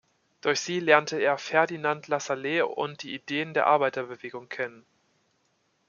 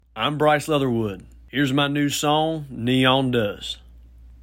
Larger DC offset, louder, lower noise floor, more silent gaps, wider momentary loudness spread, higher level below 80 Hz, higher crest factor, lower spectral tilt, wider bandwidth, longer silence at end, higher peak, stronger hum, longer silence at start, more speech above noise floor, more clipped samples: neither; second, -27 LUFS vs -21 LUFS; first, -71 dBFS vs -46 dBFS; neither; about the same, 13 LU vs 12 LU; second, -78 dBFS vs -48 dBFS; first, 26 dB vs 18 dB; second, -3.5 dB/octave vs -5 dB/octave; second, 7.4 kHz vs 16.5 kHz; first, 1.1 s vs 0.1 s; about the same, -2 dBFS vs -4 dBFS; neither; first, 0.45 s vs 0.15 s; first, 45 dB vs 24 dB; neither